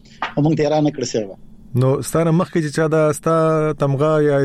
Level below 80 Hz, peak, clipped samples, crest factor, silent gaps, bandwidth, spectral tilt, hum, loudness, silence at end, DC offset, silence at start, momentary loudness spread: -48 dBFS; -8 dBFS; under 0.1%; 10 dB; none; 13.5 kHz; -6.5 dB/octave; none; -18 LUFS; 0 s; under 0.1%; 0.2 s; 7 LU